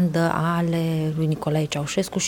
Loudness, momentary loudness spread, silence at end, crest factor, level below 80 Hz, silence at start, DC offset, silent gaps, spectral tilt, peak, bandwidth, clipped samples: -23 LUFS; 3 LU; 0 s; 16 dB; -52 dBFS; 0 s; under 0.1%; none; -5.5 dB/octave; -6 dBFS; 17 kHz; under 0.1%